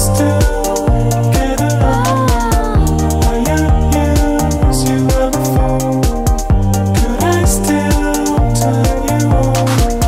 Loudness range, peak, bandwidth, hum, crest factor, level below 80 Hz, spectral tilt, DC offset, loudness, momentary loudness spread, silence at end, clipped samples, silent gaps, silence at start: 1 LU; -2 dBFS; 16.5 kHz; none; 10 dB; -18 dBFS; -6 dB/octave; under 0.1%; -13 LUFS; 2 LU; 0 s; under 0.1%; none; 0 s